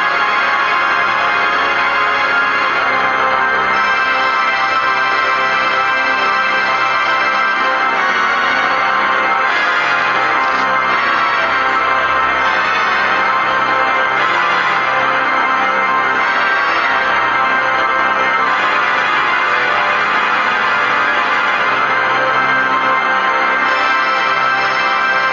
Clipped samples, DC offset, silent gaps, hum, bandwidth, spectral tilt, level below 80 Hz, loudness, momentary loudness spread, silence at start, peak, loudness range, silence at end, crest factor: under 0.1%; under 0.1%; none; none; 7.6 kHz; -2.5 dB/octave; -50 dBFS; -13 LUFS; 1 LU; 0 s; 0 dBFS; 0 LU; 0 s; 14 dB